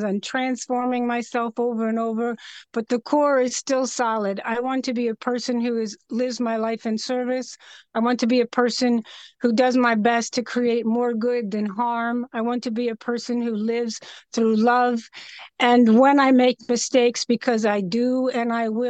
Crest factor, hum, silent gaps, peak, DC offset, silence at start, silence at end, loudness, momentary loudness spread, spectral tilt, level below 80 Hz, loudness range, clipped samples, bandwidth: 16 dB; none; none; -6 dBFS; under 0.1%; 0 s; 0 s; -22 LUFS; 9 LU; -4.5 dB/octave; -72 dBFS; 6 LU; under 0.1%; 8.8 kHz